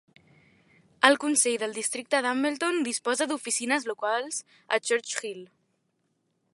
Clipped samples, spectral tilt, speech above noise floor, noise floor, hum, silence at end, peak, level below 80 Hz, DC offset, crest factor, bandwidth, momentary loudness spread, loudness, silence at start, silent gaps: under 0.1%; -0.5 dB/octave; 47 dB; -75 dBFS; none; 1.1 s; -2 dBFS; -82 dBFS; under 0.1%; 26 dB; 12 kHz; 11 LU; -26 LUFS; 1 s; none